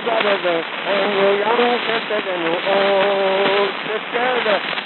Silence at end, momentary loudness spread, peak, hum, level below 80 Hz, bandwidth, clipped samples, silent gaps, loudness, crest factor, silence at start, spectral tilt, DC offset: 0 s; 5 LU; -2 dBFS; none; -86 dBFS; 4.4 kHz; under 0.1%; none; -18 LUFS; 16 dB; 0 s; -7 dB/octave; under 0.1%